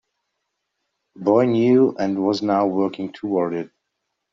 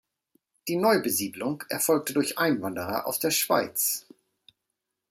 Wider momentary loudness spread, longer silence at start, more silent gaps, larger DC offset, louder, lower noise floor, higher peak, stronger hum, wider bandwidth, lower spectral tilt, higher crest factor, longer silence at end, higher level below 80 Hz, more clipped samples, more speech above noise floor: first, 11 LU vs 8 LU; first, 1.2 s vs 0.65 s; neither; neither; first, -20 LUFS vs -26 LUFS; second, -78 dBFS vs -83 dBFS; first, -4 dBFS vs -8 dBFS; neither; second, 7.4 kHz vs 16 kHz; first, -6.5 dB/octave vs -3 dB/octave; about the same, 18 dB vs 20 dB; second, 0.65 s vs 1.1 s; about the same, -68 dBFS vs -70 dBFS; neither; about the same, 59 dB vs 57 dB